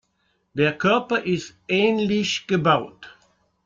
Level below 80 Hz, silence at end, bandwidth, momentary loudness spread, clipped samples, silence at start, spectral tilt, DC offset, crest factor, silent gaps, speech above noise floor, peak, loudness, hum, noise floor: -60 dBFS; 0.55 s; 7.8 kHz; 7 LU; under 0.1%; 0.55 s; -5 dB/octave; under 0.1%; 18 dB; none; 48 dB; -6 dBFS; -21 LUFS; none; -69 dBFS